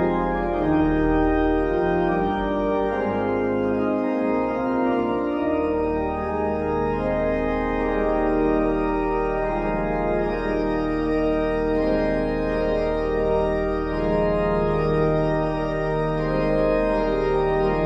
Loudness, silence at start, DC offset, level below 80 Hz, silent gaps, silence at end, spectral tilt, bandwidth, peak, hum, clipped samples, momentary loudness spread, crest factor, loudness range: -23 LUFS; 0 s; under 0.1%; -34 dBFS; none; 0 s; -9 dB/octave; 7.4 kHz; -10 dBFS; none; under 0.1%; 3 LU; 12 dB; 1 LU